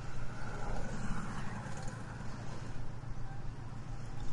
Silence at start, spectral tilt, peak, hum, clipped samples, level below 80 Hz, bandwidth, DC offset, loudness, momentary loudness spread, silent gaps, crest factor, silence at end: 0 s; -6 dB/octave; -22 dBFS; none; under 0.1%; -44 dBFS; 11 kHz; under 0.1%; -44 LUFS; 5 LU; none; 14 dB; 0 s